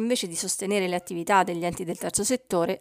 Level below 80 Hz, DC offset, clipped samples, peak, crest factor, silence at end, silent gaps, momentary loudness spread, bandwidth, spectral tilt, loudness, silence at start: -60 dBFS; under 0.1%; under 0.1%; -6 dBFS; 20 dB; 0.05 s; none; 7 LU; 16 kHz; -3.5 dB/octave; -26 LUFS; 0 s